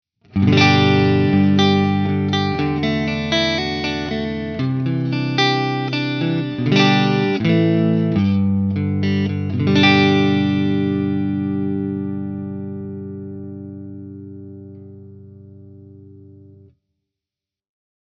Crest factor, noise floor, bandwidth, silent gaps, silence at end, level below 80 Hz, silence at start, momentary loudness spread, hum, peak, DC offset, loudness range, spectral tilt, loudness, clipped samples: 18 dB; -88 dBFS; 6.6 kHz; none; 1.7 s; -52 dBFS; 0.35 s; 18 LU; 50 Hz at -50 dBFS; 0 dBFS; under 0.1%; 17 LU; -6.5 dB/octave; -18 LUFS; under 0.1%